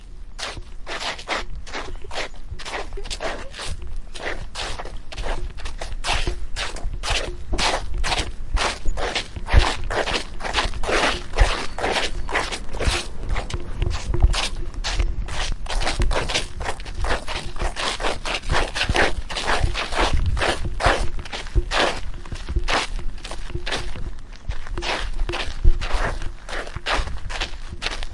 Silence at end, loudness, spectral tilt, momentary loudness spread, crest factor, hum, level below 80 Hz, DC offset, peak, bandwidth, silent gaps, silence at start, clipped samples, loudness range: 0 s; -25 LUFS; -3.5 dB/octave; 12 LU; 22 dB; none; -26 dBFS; under 0.1%; 0 dBFS; 11.5 kHz; none; 0 s; under 0.1%; 8 LU